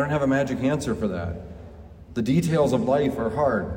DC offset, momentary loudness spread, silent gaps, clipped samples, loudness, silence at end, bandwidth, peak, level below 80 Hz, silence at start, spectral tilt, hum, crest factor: under 0.1%; 15 LU; none; under 0.1%; -24 LUFS; 0 s; 16 kHz; -10 dBFS; -46 dBFS; 0 s; -7 dB/octave; none; 14 dB